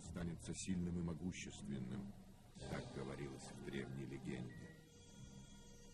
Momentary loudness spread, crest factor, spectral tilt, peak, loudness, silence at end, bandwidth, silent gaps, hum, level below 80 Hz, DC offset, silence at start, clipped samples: 16 LU; 18 dB; -5.5 dB/octave; -32 dBFS; -49 LUFS; 0 s; 13 kHz; none; none; -62 dBFS; under 0.1%; 0 s; under 0.1%